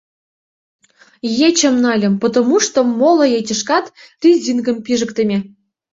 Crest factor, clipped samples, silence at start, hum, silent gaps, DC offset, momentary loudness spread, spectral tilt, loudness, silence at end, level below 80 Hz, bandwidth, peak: 14 dB; under 0.1%; 1.25 s; none; none; under 0.1%; 7 LU; -4 dB/octave; -15 LUFS; 0.45 s; -60 dBFS; 7.8 kHz; -2 dBFS